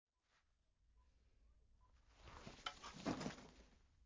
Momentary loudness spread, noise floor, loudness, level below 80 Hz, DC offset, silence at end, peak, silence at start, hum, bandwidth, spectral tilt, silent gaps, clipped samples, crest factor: 19 LU; -83 dBFS; -51 LUFS; -70 dBFS; under 0.1%; 0 s; -30 dBFS; 0.95 s; none; 7.8 kHz; -4.5 dB/octave; none; under 0.1%; 26 dB